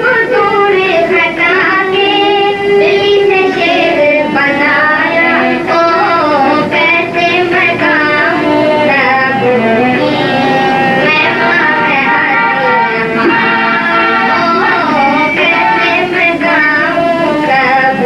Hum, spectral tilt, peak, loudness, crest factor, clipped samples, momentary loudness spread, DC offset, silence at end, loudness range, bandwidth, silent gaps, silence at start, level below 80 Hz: none; -5.5 dB/octave; 0 dBFS; -9 LUFS; 8 dB; under 0.1%; 2 LU; under 0.1%; 0 s; 0 LU; 12 kHz; none; 0 s; -46 dBFS